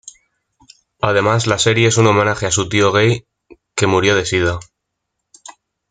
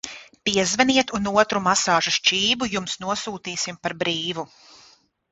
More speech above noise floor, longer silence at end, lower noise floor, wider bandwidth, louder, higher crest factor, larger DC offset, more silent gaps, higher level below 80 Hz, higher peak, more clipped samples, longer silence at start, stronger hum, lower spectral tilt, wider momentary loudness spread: first, 61 dB vs 33 dB; second, 0.4 s vs 0.85 s; first, -76 dBFS vs -56 dBFS; first, 9.6 kHz vs 8.2 kHz; first, -15 LUFS vs -21 LUFS; about the same, 16 dB vs 20 dB; neither; neither; first, -48 dBFS vs -56 dBFS; about the same, -2 dBFS vs -2 dBFS; neither; about the same, 0.05 s vs 0.05 s; neither; first, -4.5 dB/octave vs -2.5 dB/octave; about the same, 8 LU vs 10 LU